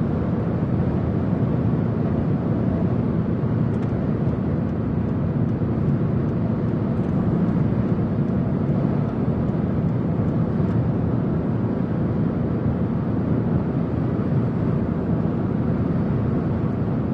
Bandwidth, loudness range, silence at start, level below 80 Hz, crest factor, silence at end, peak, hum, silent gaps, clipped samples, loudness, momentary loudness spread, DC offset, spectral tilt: 5.2 kHz; 1 LU; 0 s; -40 dBFS; 14 dB; 0 s; -8 dBFS; none; none; under 0.1%; -22 LUFS; 2 LU; under 0.1%; -11.5 dB/octave